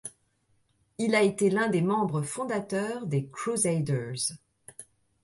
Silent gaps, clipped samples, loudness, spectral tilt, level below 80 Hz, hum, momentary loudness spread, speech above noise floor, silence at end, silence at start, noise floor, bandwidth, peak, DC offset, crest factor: none; under 0.1%; -28 LUFS; -5 dB/octave; -68 dBFS; none; 22 LU; 43 dB; 0.4 s; 0.05 s; -70 dBFS; 12 kHz; -12 dBFS; under 0.1%; 18 dB